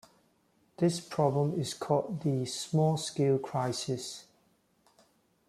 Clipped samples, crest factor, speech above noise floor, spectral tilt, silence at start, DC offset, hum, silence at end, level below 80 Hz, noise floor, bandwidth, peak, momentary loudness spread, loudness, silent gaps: under 0.1%; 20 dB; 40 dB; -6 dB/octave; 0.8 s; under 0.1%; none; 1.25 s; -70 dBFS; -70 dBFS; 13.5 kHz; -14 dBFS; 7 LU; -31 LUFS; none